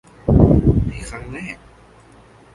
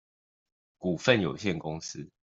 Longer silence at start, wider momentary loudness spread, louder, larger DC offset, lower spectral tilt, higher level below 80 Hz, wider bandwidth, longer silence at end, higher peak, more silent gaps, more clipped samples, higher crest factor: second, 0.25 s vs 0.8 s; first, 19 LU vs 13 LU; first, -15 LUFS vs -29 LUFS; neither; first, -9 dB/octave vs -5 dB/octave; first, -26 dBFS vs -64 dBFS; first, 11.5 kHz vs 8 kHz; first, 1 s vs 0.25 s; first, 0 dBFS vs -6 dBFS; neither; neither; second, 18 dB vs 24 dB